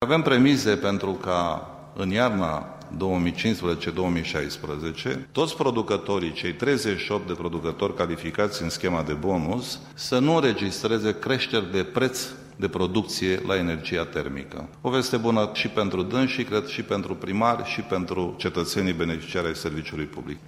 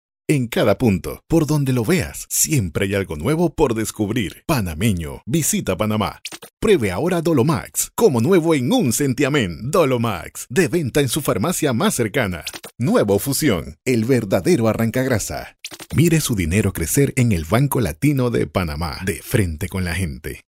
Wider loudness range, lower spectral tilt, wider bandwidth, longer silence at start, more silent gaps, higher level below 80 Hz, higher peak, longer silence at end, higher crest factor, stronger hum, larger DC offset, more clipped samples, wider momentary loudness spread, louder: about the same, 2 LU vs 3 LU; about the same, -5 dB/octave vs -5 dB/octave; about the same, 16 kHz vs 16 kHz; second, 0 s vs 0.3 s; second, none vs 6.53-6.57 s; second, -50 dBFS vs -38 dBFS; second, -6 dBFS vs -2 dBFS; about the same, 0 s vs 0.1 s; about the same, 18 dB vs 16 dB; neither; neither; neither; about the same, 8 LU vs 7 LU; second, -26 LUFS vs -19 LUFS